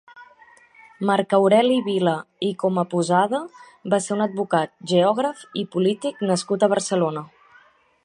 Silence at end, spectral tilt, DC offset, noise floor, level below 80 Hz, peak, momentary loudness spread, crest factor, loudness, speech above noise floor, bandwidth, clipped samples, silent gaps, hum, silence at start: 0.8 s; -5.5 dB/octave; under 0.1%; -55 dBFS; -72 dBFS; -4 dBFS; 10 LU; 18 dB; -21 LUFS; 34 dB; 11.5 kHz; under 0.1%; none; none; 0.15 s